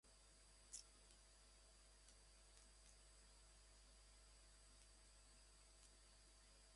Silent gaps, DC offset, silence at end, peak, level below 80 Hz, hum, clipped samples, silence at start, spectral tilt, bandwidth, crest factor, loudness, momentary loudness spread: none; under 0.1%; 0 s; -44 dBFS; -72 dBFS; 50 Hz at -70 dBFS; under 0.1%; 0.05 s; -1.5 dB/octave; 11.5 kHz; 24 dB; -67 LUFS; 8 LU